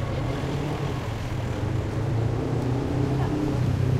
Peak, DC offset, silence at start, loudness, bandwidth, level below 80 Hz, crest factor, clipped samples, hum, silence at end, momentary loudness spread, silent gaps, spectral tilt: -12 dBFS; under 0.1%; 0 s; -27 LUFS; 13 kHz; -38 dBFS; 12 dB; under 0.1%; none; 0 s; 4 LU; none; -7.5 dB/octave